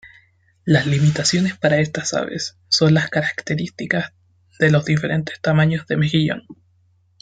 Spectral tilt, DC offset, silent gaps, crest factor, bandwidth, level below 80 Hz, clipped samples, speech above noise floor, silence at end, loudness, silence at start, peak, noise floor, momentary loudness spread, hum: -5 dB/octave; under 0.1%; none; 18 dB; 9.2 kHz; -54 dBFS; under 0.1%; 41 dB; 0.7 s; -19 LUFS; 0.05 s; -2 dBFS; -59 dBFS; 9 LU; none